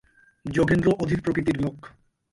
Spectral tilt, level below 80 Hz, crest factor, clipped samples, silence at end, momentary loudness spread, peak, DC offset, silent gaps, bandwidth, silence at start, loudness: -7.5 dB/octave; -46 dBFS; 18 dB; under 0.1%; 0.45 s; 9 LU; -8 dBFS; under 0.1%; none; 11.5 kHz; 0.45 s; -24 LUFS